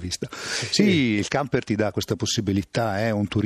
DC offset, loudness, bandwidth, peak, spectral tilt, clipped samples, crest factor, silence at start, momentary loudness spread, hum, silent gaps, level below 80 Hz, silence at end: under 0.1%; -23 LUFS; 14.5 kHz; -4 dBFS; -4.5 dB/octave; under 0.1%; 20 dB; 0 s; 8 LU; none; none; -52 dBFS; 0 s